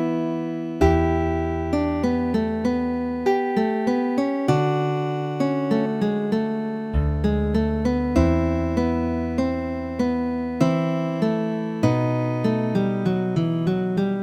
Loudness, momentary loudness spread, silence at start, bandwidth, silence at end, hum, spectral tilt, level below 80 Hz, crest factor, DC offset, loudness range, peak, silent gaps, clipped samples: -23 LUFS; 5 LU; 0 s; 11 kHz; 0 s; none; -8 dB/octave; -34 dBFS; 18 dB; under 0.1%; 1 LU; -4 dBFS; none; under 0.1%